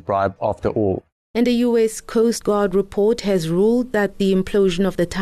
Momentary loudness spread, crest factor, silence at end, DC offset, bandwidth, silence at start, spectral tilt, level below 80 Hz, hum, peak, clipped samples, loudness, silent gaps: 4 LU; 10 dB; 0 s; under 0.1%; 13.5 kHz; 0.05 s; -6 dB/octave; -42 dBFS; none; -8 dBFS; under 0.1%; -19 LUFS; 1.12-1.34 s